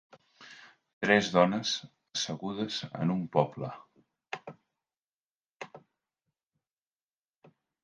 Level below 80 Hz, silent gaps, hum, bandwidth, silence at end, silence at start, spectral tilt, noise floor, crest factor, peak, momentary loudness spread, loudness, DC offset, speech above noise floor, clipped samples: -72 dBFS; 0.93-1.01 s, 4.99-5.03 s, 5.13-5.60 s; none; 10 kHz; 2.05 s; 0.4 s; -4.5 dB/octave; under -90 dBFS; 26 dB; -8 dBFS; 24 LU; -30 LUFS; under 0.1%; over 61 dB; under 0.1%